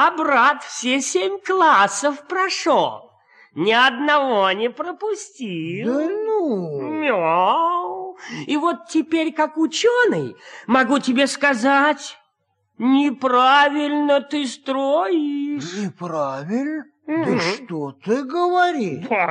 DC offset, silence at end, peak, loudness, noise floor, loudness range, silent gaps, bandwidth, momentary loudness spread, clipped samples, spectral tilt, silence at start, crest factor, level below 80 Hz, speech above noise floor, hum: under 0.1%; 0 s; -4 dBFS; -19 LUFS; -70 dBFS; 5 LU; none; 11 kHz; 12 LU; under 0.1%; -3.5 dB/octave; 0 s; 16 dB; -74 dBFS; 50 dB; none